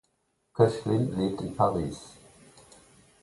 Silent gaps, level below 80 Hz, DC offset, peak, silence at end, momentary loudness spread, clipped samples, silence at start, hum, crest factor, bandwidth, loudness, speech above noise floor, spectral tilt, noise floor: none; -54 dBFS; under 0.1%; -6 dBFS; 1.1 s; 17 LU; under 0.1%; 0.55 s; none; 24 dB; 11.5 kHz; -27 LUFS; 48 dB; -7.5 dB/octave; -74 dBFS